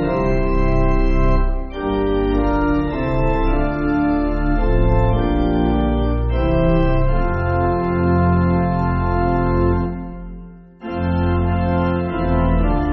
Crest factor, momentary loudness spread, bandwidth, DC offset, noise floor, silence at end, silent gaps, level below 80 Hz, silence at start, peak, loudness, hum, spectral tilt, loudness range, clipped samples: 14 dB; 5 LU; 5.6 kHz; under 0.1%; -37 dBFS; 0 s; none; -22 dBFS; 0 s; -4 dBFS; -19 LUFS; none; -7.5 dB/octave; 3 LU; under 0.1%